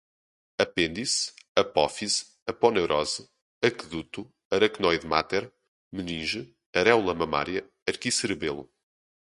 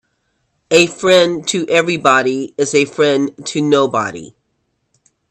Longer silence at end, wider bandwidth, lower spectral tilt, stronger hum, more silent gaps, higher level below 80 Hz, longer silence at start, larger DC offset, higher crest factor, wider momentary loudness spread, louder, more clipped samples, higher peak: second, 0.75 s vs 1.05 s; second, 11.5 kHz vs 13 kHz; about the same, -3 dB/octave vs -3.5 dB/octave; neither; first, 1.48-1.55 s, 2.42-2.46 s, 3.42-3.61 s, 4.45-4.51 s, 5.68-5.91 s, 6.66-6.73 s, 7.82-7.86 s vs none; about the same, -56 dBFS vs -60 dBFS; about the same, 0.6 s vs 0.7 s; neither; first, 24 dB vs 16 dB; first, 13 LU vs 8 LU; second, -27 LUFS vs -14 LUFS; neither; second, -4 dBFS vs 0 dBFS